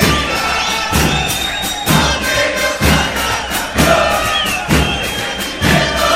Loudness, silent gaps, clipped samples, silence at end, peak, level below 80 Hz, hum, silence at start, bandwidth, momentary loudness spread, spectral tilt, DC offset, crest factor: -14 LUFS; none; under 0.1%; 0 s; 0 dBFS; -26 dBFS; none; 0 s; 16.5 kHz; 5 LU; -3.5 dB/octave; under 0.1%; 14 dB